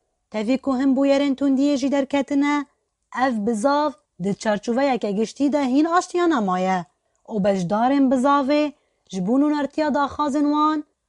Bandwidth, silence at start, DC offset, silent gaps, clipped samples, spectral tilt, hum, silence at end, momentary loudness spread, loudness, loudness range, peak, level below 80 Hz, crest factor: 11 kHz; 0.35 s; under 0.1%; none; under 0.1%; -6 dB/octave; none; 0.25 s; 8 LU; -21 LUFS; 2 LU; -6 dBFS; -60 dBFS; 16 dB